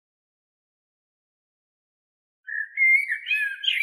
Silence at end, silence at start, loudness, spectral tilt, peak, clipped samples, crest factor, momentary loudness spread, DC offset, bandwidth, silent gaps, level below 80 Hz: 0 s; 2.5 s; -21 LUFS; 11 dB/octave; -10 dBFS; under 0.1%; 18 dB; 13 LU; under 0.1%; 13.5 kHz; none; under -90 dBFS